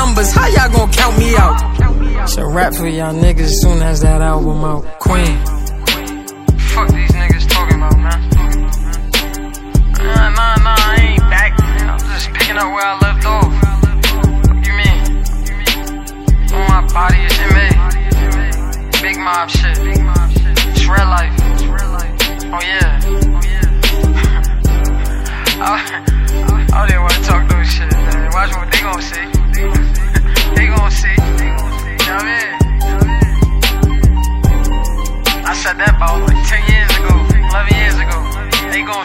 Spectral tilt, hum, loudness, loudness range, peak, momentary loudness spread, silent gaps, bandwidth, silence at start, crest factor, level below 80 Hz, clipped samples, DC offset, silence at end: -4.5 dB/octave; none; -13 LUFS; 2 LU; 0 dBFS; 7 LU; none; 16.5 kHz; 0 s; 10 dB; -12 dBFS; under 0.1%; under 0.1%; 0 s